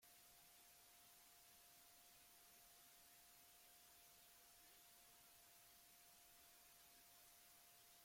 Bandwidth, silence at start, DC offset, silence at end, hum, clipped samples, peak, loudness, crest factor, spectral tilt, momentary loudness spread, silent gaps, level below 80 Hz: 16.5 kHz; 0 s; under 0.1%; 0 s; none; under 0.1%; -56 dBFS; -66 LUFS; 14 dB; 0 dB/octave; 0 LU; none; -90 dBFS